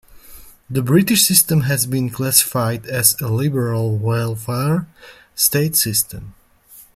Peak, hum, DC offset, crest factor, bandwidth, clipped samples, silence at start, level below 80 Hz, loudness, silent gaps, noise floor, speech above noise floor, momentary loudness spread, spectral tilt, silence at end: 0 dBFS; none; under 0.1%; 18 dB; 16.5 kHz; under 0.1%; 0.1 s; -50 dBFS; -16 LUFS; none; -46 dBFS; 29 dB; 11 LU; -4 dB/octave; 0.15 s